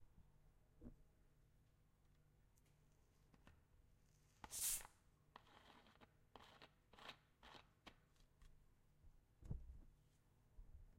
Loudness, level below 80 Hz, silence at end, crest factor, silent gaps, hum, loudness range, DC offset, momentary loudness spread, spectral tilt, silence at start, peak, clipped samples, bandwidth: -49 LUFS; -68 dBFS; 0 s; 28 dB; none; none; 14 LU; under 0.1%; 24 LU; -1.5 dB/octave; 0 s; -32 dBFS; under 0.1%; 16 kHz